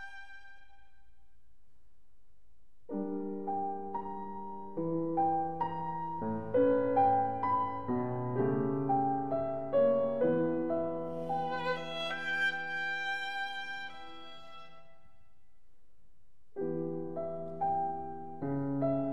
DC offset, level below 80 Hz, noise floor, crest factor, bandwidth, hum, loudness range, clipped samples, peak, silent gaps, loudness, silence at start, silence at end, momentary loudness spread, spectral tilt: 0.5%; -66 dBFS; -70 dBFS; 18 dB; 11 kHz; none; 12 LU; under 0.1%; -18 dBFS; none; -33 LUFS; 0 s; 0 s; 14 LU; -7 dB/octave